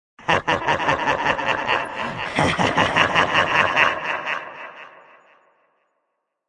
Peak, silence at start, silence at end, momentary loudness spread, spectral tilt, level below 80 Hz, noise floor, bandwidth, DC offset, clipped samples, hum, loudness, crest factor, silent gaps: -2 dBFS; 0.2 s; 1.6 s; 10 LU; -4 dB/octave; -52 dBFS; -75 dBFS; 11.5 kHz; under 0.1%; under 0.1%; none; -20 LUFS; 22 dB; none